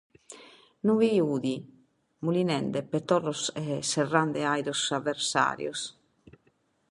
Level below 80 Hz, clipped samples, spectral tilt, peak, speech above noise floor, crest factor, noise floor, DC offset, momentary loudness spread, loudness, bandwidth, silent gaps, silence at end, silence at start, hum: -70 dBFS; under 0.1%; -4.5 dB/octave; -6 dBFS; 42 dB; 22 dB; -69 dBFS; under 0.1%; 11 LU; -28 LUFS; 11.5 kHz; none; 1 s; 0.3 s; none